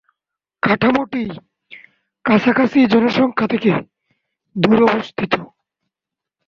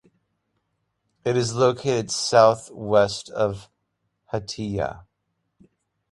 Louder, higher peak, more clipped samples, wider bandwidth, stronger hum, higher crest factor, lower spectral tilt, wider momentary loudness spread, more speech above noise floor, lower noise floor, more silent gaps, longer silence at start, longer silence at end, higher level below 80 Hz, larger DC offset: first, -16 LUFS vs -22 LUFS; about the same, -2 dBFS vs -2 dBFS; neither; second, 7 kHz vs 11.5 kHz; neither; second, 16 dB vs 22 dB; first, -7.5 dB/octave vs -4.5 dB/octave; about the same, 12 LU vs 14 LU; first, 70 dB vs 54 dB; first, -86 dBFS vs -76 dBFS; neither; second, 0.65 s vs 1.25 s; about the same, 1.05 s vs 1.1 s; about the same, -54 dBFS vs -54 dBFS; neither